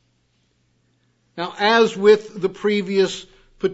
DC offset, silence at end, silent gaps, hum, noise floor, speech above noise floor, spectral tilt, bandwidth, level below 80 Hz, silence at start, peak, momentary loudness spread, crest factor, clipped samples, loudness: under 0.1%; 0 s; none; none; -65 dBFS; 47 dB; -4.5 dB/octave; 8 kHz; -62 dBFS; 1.35 s; -2 dBFS; 15 LU; 18 dB; under 0.1%; -19 LUFS